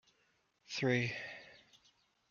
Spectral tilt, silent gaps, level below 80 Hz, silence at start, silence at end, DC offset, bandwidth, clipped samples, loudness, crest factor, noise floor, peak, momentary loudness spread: -5.5 dB/octave; none; -78 dBFS; 0.7 s; 0.75 s; under 0.1%; 7.2 kHz; under 0.1%; -37 LUFS; 22 dB; -77 dBFS; -20 dBFS; 19 LU